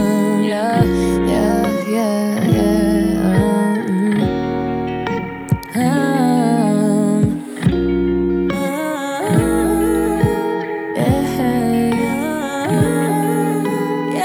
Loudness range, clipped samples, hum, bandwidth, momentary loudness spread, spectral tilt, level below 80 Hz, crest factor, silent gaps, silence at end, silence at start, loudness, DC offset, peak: 2 LU; under 0.1%; none; over 20 kHz; 6 LU; -6.5 dB/octave; -36 dBFS; 12 dB; none; 0 s; 0 s; -17 LUFS; under 0.1%; -4 dBFS